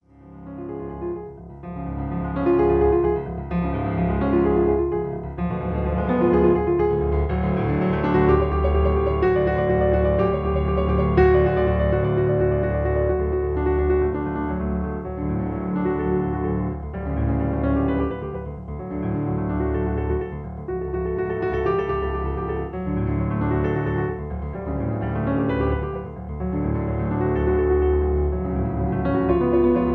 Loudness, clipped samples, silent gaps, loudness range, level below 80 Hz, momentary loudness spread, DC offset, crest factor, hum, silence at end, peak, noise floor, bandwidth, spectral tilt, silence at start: -22 LUFS; under 0.1%; none; 5 LU; -30 dBFS; 11 LU; under 0.1%; 18 dB; none; 0 s; -4 dBFS; -42 dBFS; 4.5 kHz; -11 dB/octave; 0.25 s